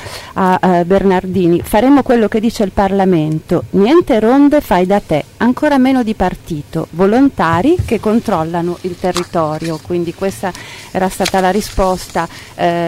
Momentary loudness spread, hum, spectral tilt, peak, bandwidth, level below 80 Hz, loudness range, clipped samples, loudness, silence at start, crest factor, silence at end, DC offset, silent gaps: 10 LU; none; -6.5 dB/octave; -2 dBFS; 16 kHz; -34 dBFS; 5 LU; under 0.1%; -13 LUFS; 0 s; 10 dB; 0 s; under 0.1%; none